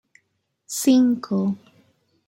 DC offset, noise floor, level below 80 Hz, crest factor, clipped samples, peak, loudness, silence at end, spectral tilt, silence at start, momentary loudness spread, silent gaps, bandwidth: under 0.1%; -72 dBFS; -72 dBFS; 16 dB; under 0.1%; -8 dBFS; -21 LUFS; 0.7 s; -5 dB/octave; 0.7 s; 13 LU; none; 16.5 kHz